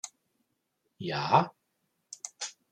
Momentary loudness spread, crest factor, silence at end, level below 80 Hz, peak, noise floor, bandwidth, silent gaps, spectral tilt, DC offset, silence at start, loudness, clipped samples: 19 LU; 26 dB; 0.2 s; -74 dBFS; -6 dBFS; -79 dBFS; 14.5 kHz; none; -4 dB/octave; under 0.1%; 0.05 s; -30 LUFS; under 0.1%